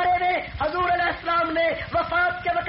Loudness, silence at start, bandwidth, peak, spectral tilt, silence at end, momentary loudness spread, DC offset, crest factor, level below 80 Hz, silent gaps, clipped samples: -23 LUFS; 0 s; 5.8 kHz; -12 dBFS; -2 dB/octave; 0 s; 4 LU; under 0.1%; 10 dB; -44 dBFS; none; under 0.1%